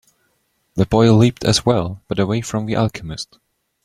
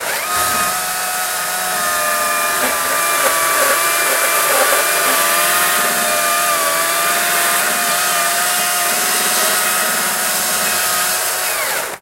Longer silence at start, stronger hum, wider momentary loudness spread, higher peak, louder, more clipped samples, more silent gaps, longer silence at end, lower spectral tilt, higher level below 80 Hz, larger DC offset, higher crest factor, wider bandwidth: first, 0.75 s vs 0 s; neither; first, 16 LU vs 4 LU; about the same, -2 dBFS vs -2 dBFS; second, -17 LUFS vs -14 LUFS; neither; neither; first, 0.6 s vs 0.05 s; first, -6 dB/octave vs 0.5 dB/octave; first, -42 dBFS vs -54 dBFS; neither; about the same, 16 dB vs 14 dB; second, 13 kHz vs 16 kHz